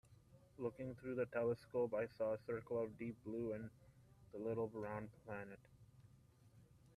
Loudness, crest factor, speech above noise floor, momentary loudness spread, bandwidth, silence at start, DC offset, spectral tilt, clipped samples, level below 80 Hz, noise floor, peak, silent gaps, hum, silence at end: -45 LUFS; 18 dB; 24 dB; 10 LU; 13 kHz; 0.1 s; under 0.1%; -8.5 dB/octave; under 0.1%; -74 dBFS; -69 dBFS; -30 dBFS; none; none; 0.3 s